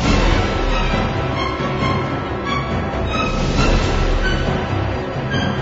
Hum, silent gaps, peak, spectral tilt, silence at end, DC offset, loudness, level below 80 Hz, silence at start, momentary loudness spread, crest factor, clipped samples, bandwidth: none; none; -2 dBFS; -6 dB/octave; 0 s; under 0.1%; -19 LUFS; -22 dBFS; 0 s; 5 LU; 16 dB; under 0.1%; 7.8 kHz